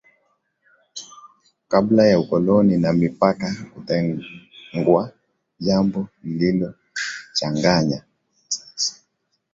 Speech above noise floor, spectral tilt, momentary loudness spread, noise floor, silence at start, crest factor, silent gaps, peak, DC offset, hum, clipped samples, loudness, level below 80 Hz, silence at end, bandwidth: 53 dB; -5.5 dB/octave; 17 LU; -72 dBFS; 0.95 s; 20 dB; none; -2 dBFS; under 0.1%; none; under 0.1%; -20 LUFS; -54 dBFS; 0.6 s; 7.8 kHz